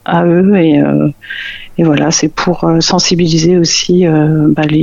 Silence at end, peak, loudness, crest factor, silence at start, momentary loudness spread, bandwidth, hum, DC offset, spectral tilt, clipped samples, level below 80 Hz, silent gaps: 0 s; 0 dBFS; -10 LUFS; 10 dB; 0.1 s; 7 LU; 7.6 kHz; none; under 0.1%; -5 dB/octave; under 0.1%; -38 dBFS; none